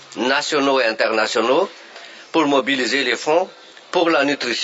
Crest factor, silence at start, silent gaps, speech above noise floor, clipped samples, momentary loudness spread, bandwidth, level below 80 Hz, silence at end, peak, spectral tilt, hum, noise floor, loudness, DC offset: 16 dB; 0.1 s; none; 22 dB; under 0.1%; 9 LU; 8 kHz; -78 dBFS; 0 s; -4 dBFS; -2.5 dB/octave; none; -40 dBFS; -18 LUFS; under 0.1%